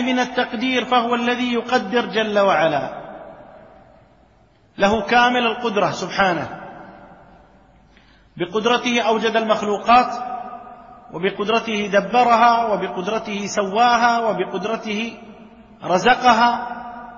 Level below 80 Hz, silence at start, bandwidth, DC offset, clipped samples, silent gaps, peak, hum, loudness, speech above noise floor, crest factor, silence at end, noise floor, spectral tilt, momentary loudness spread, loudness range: -54 dBFS; 0 s; 7.4 kHz; under 0.1%; under 0.1%; none; -2 dBFS; none; -18 LUFS; 36 dB; 18 dB; 0 s; -54 dBFS; -4 dB/octave; 16 LU; 4 LU